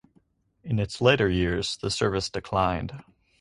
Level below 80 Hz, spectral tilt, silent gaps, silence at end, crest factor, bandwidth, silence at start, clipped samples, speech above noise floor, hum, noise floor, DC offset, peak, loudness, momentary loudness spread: -44 dBFS; -5 dB/octave; none; 0.4 s; 22 dB; 11 kHz; 0.65 s; under 0.1%; 40 dB; none; -66 dBFS; under 0.1%; -4 dBFS; -25 LUFS; 13 LU